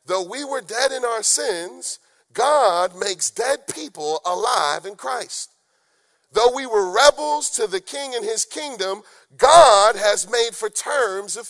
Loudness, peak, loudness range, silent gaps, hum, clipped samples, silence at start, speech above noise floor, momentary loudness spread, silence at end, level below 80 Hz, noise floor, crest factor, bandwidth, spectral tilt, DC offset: -19 LUFS; 0 dBFS; 7 LU; none; none; under 0.1%; 0.1 s; 46 dB; 14 LU; 0 s; -56 dBFS; -65 dBFS; 20 dB; 12 kHz; -0.5 dB/octave; under 0.1%